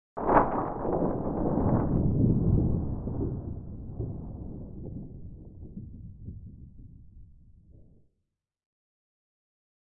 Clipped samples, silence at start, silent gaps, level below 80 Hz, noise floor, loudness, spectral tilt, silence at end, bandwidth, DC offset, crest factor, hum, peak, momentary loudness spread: under 0.1%; 0.15 s; none; -40 dBFS; -82 dBFS; -29 LUFS; -13.5 dB/octave; 2.6 s; 3 kHz; under 0.1%; 24 dB; none; -8 dBFS; 21 LU